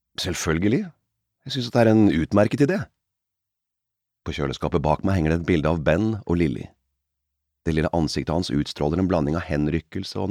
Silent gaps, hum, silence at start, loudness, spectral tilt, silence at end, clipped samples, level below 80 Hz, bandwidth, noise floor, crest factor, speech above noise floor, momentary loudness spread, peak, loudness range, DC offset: none; none; 0.2 s; -23 LUFS; -6.5 dB/octave; 0 s; under 0.1%; -40 dBFS; 15.5 kHz; -83 dBFS; 18 dB; 62 dB; 12 LU; -4 dBFS; 3 LU; under 0.1%